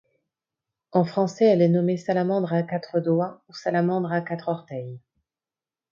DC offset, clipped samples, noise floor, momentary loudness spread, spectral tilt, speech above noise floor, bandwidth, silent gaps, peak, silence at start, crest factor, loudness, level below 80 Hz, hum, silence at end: under 0.1%; under 0.1%; under -90 dBFS; 12 LU; -8 dB/octave; over 67 dB; 7.4 kHz; none; -6 dBFS; 0.95 s; 18 dB; -24 LUFS; -72 dBFS; none; 0.95 s